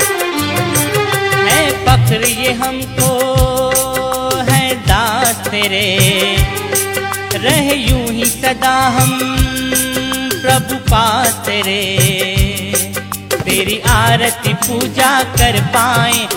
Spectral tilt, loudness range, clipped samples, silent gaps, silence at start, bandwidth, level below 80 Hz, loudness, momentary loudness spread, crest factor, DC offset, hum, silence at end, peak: -3.5 dB/octave; 1 LU; under 0.1%; none; 0 s; 18 kHz; -26 dBFS; -13 LUFS; 5 LU; 14 dB; under 0.1%; none; 0 s; 0 dBFS